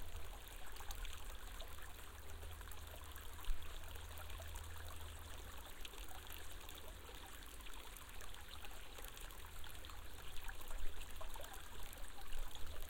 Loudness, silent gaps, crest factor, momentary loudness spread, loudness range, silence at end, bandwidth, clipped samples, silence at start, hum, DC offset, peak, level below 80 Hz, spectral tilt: -53 LUFS; none; 18 dB; 3 LU; 1 LU; 0 s; 17 kHz; under 0.1%; 0 s; none; under 0.1%; -26 dBFS; -50 dBFS; -3 dB/octave